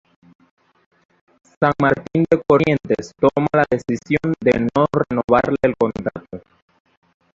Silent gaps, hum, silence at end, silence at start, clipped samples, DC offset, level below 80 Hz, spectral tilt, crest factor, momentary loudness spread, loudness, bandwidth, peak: 5.24-5.28 s; none; 1 s; 1.6 s; under 0.1%; under 0.1%; -48 dBFS; -7.5 dB/octave; 18 dB; 8 LU; -18 LUFS; 7.8 kHz; 0 dBFS